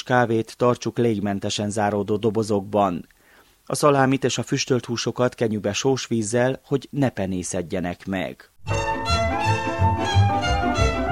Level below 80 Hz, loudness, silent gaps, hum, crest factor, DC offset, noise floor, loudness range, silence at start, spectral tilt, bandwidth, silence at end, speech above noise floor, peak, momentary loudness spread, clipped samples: -38 dBFS; -23 LUFS; none; none; 20 dB; under 0.1%; -55 dBFS; 3 LU; 0.05 s; -5 dB/octave; 14 kHz; 0 s; 33 dB; -4 dBFS; 8 LU; under 0.1%